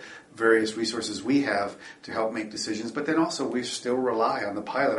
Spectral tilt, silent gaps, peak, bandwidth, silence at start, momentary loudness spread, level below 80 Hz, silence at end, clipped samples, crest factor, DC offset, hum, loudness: -4 dB/octave; none; -8 dBFS; 11.5 kHz; 0 s; 8 LU; -68 dBFS; 0 s; under 0.1%; 20 dB; under 0.1%; none; -27 LUFS